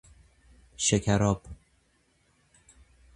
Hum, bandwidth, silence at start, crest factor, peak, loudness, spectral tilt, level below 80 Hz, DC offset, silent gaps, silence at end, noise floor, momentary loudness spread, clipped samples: none; 11.5 kHz; 0.8 s; 22 dB; -10 dBFS; -27 LUFS; -4.5 dB/octave; -50 dBFS; under 0.1%; none; 1.6 s; -68 dBFS; 11 LU; under 0.1%